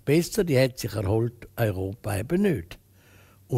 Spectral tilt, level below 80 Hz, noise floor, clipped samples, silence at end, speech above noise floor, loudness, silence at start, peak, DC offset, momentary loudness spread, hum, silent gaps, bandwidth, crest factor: -6.5 dB/octave; -50 dBFS; -55 dBFS; under 0.1%; 0 s; 30 dB; -26 LUFS; 0.05 s; -8 dBFS; under 0.1%; 9 LU; none; none; 16 kHz; 18 dB